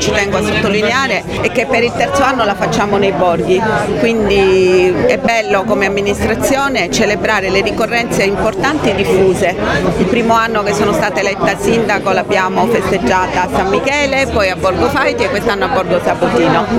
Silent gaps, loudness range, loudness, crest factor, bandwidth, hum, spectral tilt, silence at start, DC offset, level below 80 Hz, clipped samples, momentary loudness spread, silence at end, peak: none; 1 LU; -13 LUFS; 12 dB; 16 kHz; none; -4.5 dB/octave; 0 s; under 0.1%; -34 dBFS; under 0.1%; 3 LU; 0 s; 0 dBFS